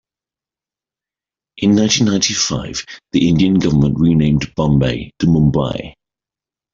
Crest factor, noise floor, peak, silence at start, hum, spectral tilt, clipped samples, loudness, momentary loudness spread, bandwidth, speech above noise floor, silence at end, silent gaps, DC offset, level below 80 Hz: 16 dB; -90 dBFS; 0 dBFS; 1.55 s; none; -5 dB/octave; under 0.1%; -15 LUFS; 10 LU; 7.8 kHz; 75 dB; 0.85 s; none; under 0.1%; -38 dBFS